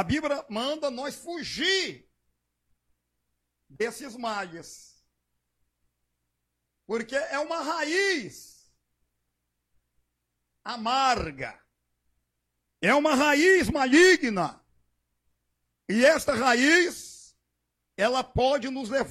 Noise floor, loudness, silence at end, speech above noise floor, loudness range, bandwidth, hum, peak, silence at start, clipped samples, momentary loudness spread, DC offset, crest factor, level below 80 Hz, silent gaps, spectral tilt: -80 dBFS; -25 LUFS; 0 s; 55 dB; 15 LU; 15 kHz; 60 Hz at -65 dBFS; -6 dBFS; 0 s; under 0.1%; 16 LU; under 0.1%; 20 dB; -54 dBFS; none; -3.5 dB/octave